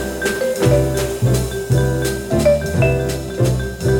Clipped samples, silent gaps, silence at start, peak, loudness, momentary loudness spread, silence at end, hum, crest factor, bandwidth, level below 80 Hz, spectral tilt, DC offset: under 0.1%; none; 0 s; -2 dBFS; -18 LUFS; 5 LU; 0 s; none; 14 dB; 18 kHz; -28 dBFS; -6 dB/octave; under 0.1%